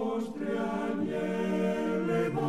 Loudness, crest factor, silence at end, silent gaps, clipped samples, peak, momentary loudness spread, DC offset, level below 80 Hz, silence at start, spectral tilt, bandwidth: -31 LUFS; 12 dB; 0 s; none; under 0.1%; -18 dBFS; 4 LU; 0.2%; -62 dBFS; 0 s; -7.5 dB/octave; 13.5 kHz